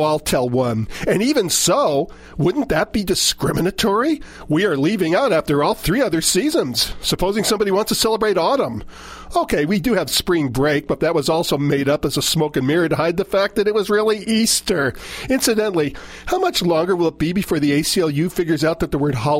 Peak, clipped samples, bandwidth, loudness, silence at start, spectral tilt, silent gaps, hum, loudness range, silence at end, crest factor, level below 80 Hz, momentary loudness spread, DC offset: -4 dBFS; under 0.1%; 16 kHz; -18 LUFS; 0 s; -4 dB/octave; none; none; 1 LU; 0 s; 14 dB; -40 dBFS; 5 LU; under 0.1%